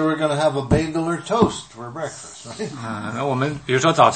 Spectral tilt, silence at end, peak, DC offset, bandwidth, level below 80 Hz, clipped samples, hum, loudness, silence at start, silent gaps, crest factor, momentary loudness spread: -5.5 dB/octave; 0 s; 0 dBFS; 0.1%; 8.8 kHz; -44 dBFS; under 0.1%; none; -21 LUFS; 0 s; none; 20 dB; 13 LU